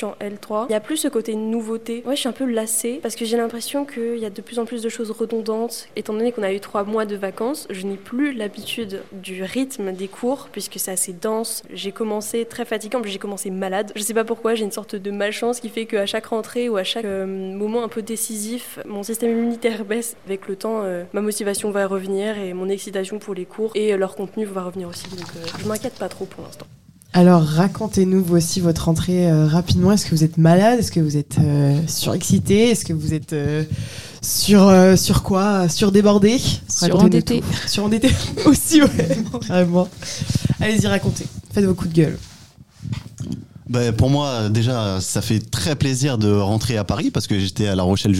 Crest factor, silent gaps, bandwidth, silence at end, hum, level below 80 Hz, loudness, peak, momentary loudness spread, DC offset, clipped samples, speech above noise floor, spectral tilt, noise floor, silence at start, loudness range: 18 dB; none; 16.5 kHz; 0 s; none; -44 dBFS; -20 LUFS; -2 dBFS; 14 LU; 0.4%; under 0.1%; 26 dB; -5.5 dB/octave; -45 dBFS; 0 s; 9 LU